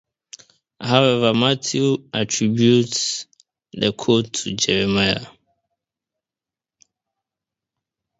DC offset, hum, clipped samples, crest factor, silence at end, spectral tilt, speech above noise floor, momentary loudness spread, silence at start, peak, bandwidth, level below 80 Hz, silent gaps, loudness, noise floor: under 0.1%; none; under 0.1%; 22 dB; 2.9 s; -4 dB/octave; 71 dB; 9 LU; 0.8 s; 0 dBFS; 8 kHz; -54 dBFS; none; -19 LUFS; -89 dBFS